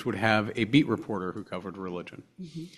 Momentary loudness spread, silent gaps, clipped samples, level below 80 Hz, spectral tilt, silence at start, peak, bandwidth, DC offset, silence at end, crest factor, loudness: 18 LU; none; under 0.1%; -62 dBFS; -6.5 dB/octave; 0 s; -6 dBFS; 12.5 kHz; under 0.1%; 0 s; 22 dB; -28 LUFS